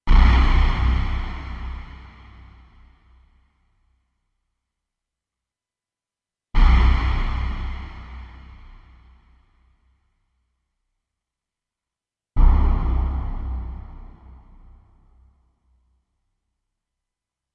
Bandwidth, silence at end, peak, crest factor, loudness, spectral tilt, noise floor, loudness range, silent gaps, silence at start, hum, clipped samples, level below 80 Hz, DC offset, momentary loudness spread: 5.8 kHz; 3.5 s; -2 dBFS; 20 dB; -23 LUFS; -7.5 dB/octave; under -90 dBFS; 16 LU; none; 0.05 s; none; under 0.1%; -24 dBFS; under 0.1%; 24 LU